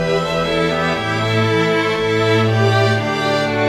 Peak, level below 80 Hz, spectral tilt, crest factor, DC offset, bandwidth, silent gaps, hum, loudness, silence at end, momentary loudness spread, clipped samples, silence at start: -2 dBFS; -44 dBFS; -5.5 dB/octave; 14 dB; under 0.1%; 12.5 kHz; none; none; -16 LUFS; 0 s; 3 LU; under 0.1%; 0 s